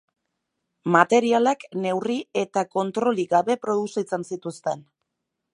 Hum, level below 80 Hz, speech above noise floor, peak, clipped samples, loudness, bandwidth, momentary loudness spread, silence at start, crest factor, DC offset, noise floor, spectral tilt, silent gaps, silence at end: none; -76 dBFS; 58 dB; -2 dBFS; under 0.1%; -23 LUFS; 11 kHz; 12 LU; 0.85 s; 22 dB; under 0.1%; -81 dBFS; -5 dB/octave; none; 0.75 s